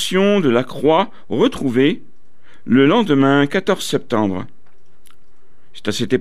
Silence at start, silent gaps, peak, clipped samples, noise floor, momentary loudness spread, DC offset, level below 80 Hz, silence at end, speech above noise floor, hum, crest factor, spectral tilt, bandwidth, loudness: 0 s; none; -2 dBFS; under 0.1%; -57 dBFS; 10 LU; 3%; -54 dBFS; 0 s; 41 dB; none; 16 dB; -5.5 dB/octave; 14.5 kHz; -16 LUFS